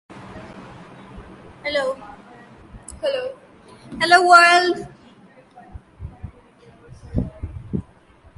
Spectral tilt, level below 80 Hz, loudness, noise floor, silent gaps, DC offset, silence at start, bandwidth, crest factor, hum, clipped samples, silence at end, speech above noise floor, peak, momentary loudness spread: -4 dB/octave; -42 dBFS; -18 LUFS; -51 dBFS; none; under 0.1%; 0.1 s; 11.5 kHz; 22 dB; none; under 0.1%; 0.55 s; 34 dB; 0 dBFS; 30 LU